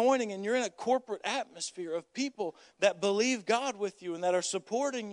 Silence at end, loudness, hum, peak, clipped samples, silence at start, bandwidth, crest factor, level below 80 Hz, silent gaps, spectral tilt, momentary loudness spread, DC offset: 0 s; -32 LUFS; none; -12 dBFS; under 0.1%; 0 s; 11 kHz; 20 dB; -86 dBFS; none; -3 dB/octave; 9 LU; under 0.1%